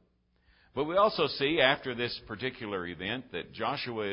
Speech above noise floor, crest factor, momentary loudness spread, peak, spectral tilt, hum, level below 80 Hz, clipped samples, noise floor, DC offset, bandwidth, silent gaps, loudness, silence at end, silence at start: 38 dB; 24 dB; 11 LU; -8 dBFS; -8.5 dB/octave; none; -60 dBFS; under 0.1%; -69 dBFS; under 0.1%; 5.6 kHz; none; -30 LUFS; 0 s; 0.75 s